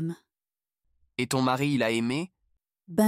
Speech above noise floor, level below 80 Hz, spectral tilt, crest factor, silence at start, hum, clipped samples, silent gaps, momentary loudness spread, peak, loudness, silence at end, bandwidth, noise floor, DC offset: over 64 dB; -68 dBFS; -5.5 dB/octave; 18 dB; 0 s; none; under 0.1%; none; 14 LU; -10 dBFS; -28 LUFS; 0 s; 16 kHz; under -90 dBFS; under 0.1%